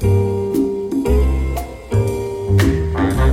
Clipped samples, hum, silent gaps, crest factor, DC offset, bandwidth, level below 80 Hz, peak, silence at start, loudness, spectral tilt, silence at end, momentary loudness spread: under 0.1%; none; none; 14 dB; under 0.1%; 16.5 kHz; -22 dBFS; -2 dBFS; 0 s; -18 LUFS; -7.5 dB/octave; 0 s; 6 LU